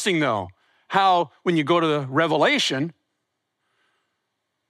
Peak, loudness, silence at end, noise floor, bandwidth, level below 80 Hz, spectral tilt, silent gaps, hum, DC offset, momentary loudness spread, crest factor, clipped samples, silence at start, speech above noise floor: -6 dBFS; -21 LUFS; 1.8 s; -78 dBFS; 13.5 kHz; -74 dBFS; -4.5 dB/octave; none; none; under 0.1%; 10 LU; 18 dB; under 0.1%; 0 s; 57 dB